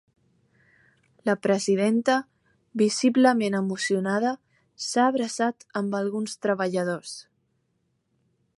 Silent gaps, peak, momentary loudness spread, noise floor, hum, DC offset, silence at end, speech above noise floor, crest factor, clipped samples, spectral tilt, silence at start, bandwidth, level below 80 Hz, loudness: none; -6 dBFS; 11 LU; -73 dBFS; none; under 0.1%; 1.4 s; 49 dB; 20 dB; under 0.1%; -4.5 dB/octave; 1.25 s; 11.5 kHz; -74 dBFS; -25 LUFS